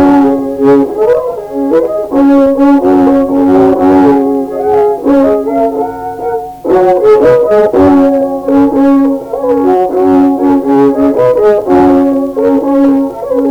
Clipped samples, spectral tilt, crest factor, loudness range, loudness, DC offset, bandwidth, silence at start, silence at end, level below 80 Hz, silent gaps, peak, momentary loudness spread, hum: 0.1%; -8 dB/octave; 8 dB; 2 LU; -8 LUFS; under 0.1%; 6.2 kHz; 0 s; 0 s; -40 dBFS; none; 0 dBFS; 6 LU; none